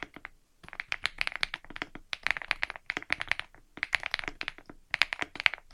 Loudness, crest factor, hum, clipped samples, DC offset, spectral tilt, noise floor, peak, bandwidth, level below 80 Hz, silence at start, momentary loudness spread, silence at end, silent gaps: -32 LUFS; 36 dB; none; under 0.1%; under 0.1%; -1 dB/octave; -52 dBFS; 0 dBFS; 15.5 kHz; -54 dBFS; 0 s; 13 LU; 0 s; none